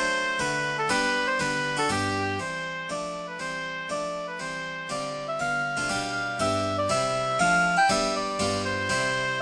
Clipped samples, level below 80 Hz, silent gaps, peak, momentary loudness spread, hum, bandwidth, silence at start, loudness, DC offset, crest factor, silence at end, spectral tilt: under 0.1%; -54 dBFS; none; -10 dBFS; 10 LU; none; 10 kHz; 0 s; -26 LUFS; under 0.1%; 16 dB; 0 s; -3.5 dB/octave